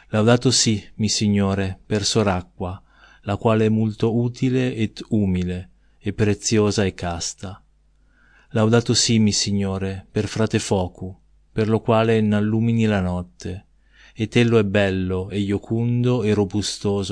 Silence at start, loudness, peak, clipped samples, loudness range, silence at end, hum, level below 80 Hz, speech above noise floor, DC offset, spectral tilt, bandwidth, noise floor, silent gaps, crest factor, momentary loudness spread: 0.1 s; -20 LUFS; -2 dBFS; under 0.1%; 2 LU; 0 s; none; -48 dBFS; 37 dB; under 0.1%; -5 dB/octave; 10.5 kHz; -57 dBFS; none; 20 dB; 14 LU